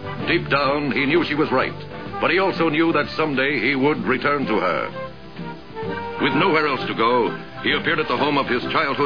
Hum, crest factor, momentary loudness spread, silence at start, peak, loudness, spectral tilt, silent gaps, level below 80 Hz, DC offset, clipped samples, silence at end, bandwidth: none; 16 dB; 12 LU; 0 s; -4 dBFS; -20 LUFS; -7 dB/octave; none; -50 dBFS; 0.8%; under 0.1%; 0 s; 5.4 kHz